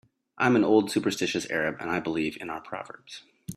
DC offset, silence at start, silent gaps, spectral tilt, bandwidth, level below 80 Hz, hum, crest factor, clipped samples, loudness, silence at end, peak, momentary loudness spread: under 0.1%; 0.35 s; none; -5 dB/octave; 14.5 kHz; -66 dBFS; none; 20 dB; under 0.1%; -26 LUFS; 0 s; -8 dBFS; 19 LU